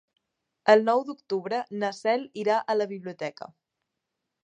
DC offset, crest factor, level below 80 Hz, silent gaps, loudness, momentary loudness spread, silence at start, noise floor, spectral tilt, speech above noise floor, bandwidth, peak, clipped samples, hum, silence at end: under 0.1%; 24 dB; -84 dBFS; none; -26 LUFS; 15 LU; 0.65 s; -84 dBFS; -5 dB/octave; 58 dB; 9.4 kHz; -4 dBFS; under 0.1%; none; 1 s